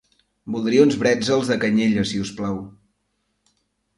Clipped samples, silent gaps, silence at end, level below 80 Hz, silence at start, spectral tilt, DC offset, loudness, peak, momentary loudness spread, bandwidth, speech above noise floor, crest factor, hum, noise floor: under 0.1%; none; 1.3 s; -54 dBFS; 0.45 s; -5.5 dB/octave; under 0.1%; -20 LUFS; -2 dBFS; 13 LU; 11.5 kHz; 52 dB; 20 dB; none; -72 dBFS